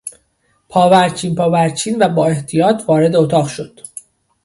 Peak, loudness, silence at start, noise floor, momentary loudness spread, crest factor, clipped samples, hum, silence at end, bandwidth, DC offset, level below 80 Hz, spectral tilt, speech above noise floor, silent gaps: 0 dBFS; -14 LUFS; 0.05 s; -61 dBFS; 19 LU; 14 dB; under 0.1%; none; 0.8 s; 11.5 kHz; under 0.1%; -54 dBFS; -5.5 dB/octave; 48 dB; none